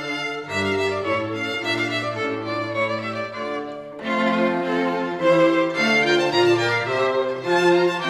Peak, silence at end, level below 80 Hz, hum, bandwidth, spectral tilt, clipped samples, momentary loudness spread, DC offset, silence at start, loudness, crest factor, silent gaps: -6 dBFS; 0 s; -66 dBFS; none; 13 kHz; -5 dB/octave; under 0.1%; 9 LU; under 0.1%; 0 s; -21 LUFS; 16 dB; none